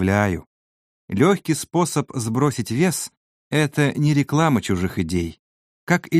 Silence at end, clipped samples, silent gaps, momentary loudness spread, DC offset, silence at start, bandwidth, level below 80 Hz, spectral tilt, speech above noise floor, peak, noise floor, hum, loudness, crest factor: 0 s; under 0.1%; 0.47-1.08 s, 3.17-3.51 s, 5.39-5.87 s; 9 LU; under 0.1%; 0 s; 15.5 kHz; -48 dBFS; -5.5 dB/octave; over 70 dB; -2 dBFS; under -90 dBFS; none; -21 LUFS; 20 dB